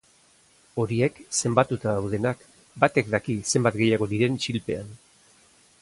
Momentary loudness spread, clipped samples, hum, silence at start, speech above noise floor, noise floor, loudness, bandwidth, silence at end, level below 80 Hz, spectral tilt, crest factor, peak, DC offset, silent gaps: 10 LU; under 0.1%; none; 0.75 s; 35 dB; -59 dBFS; -25 LUFS; 11.5 kHz; 0.85 s; -56 dBFS; -5 dB/octave; 22 dB; -4 dBFS; under 0.1%; none